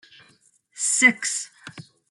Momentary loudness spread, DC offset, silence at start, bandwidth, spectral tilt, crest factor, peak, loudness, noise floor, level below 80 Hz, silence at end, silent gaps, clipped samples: 25 LU; under 0.1%; 0.75 s; 12 kHz; -0.5 dB/octave; 22 dB; -4 dBFS; -20 LUFS; -60 dBFS; -78 dBFS; 0.3 s; none; under 0.1%